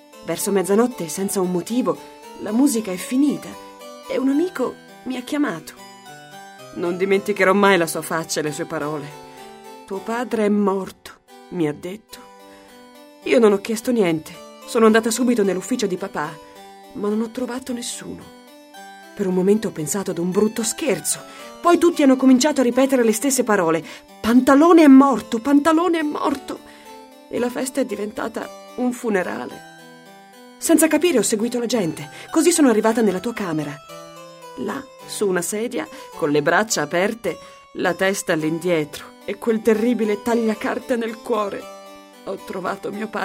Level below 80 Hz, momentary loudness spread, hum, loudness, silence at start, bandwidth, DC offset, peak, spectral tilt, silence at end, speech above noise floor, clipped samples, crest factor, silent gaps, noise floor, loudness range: -60 dBFS; 21 LU; none; -20 LUFS; 0.15 s; 16 kHz; under 0.1%; 0 dBFS; -4.5 dB/octave; 0 s; 25 dB; under 0.1%; 20 dB; none; -45 dBFS; 10 LU